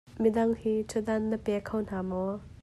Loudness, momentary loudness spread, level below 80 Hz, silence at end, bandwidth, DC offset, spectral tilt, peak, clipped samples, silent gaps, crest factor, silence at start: -30 LUFS; 7 LU; -54 dBFS; 0.1 s; 12.5 kHz; under 0.1%; -7 dB/octave; -14 dBFS; under 0.1%; none; 16 dB; 0.1 s